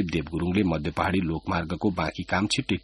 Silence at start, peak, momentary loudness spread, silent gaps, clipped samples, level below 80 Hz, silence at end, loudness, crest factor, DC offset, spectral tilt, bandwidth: 0 s; -8 dBFS; 4 LU; none; under 0.1%; -44 dBFS; 0.05 s; -27 LUFS; 18 dB; under 0.1%; -5.5 dB/octave; 11.5 kHz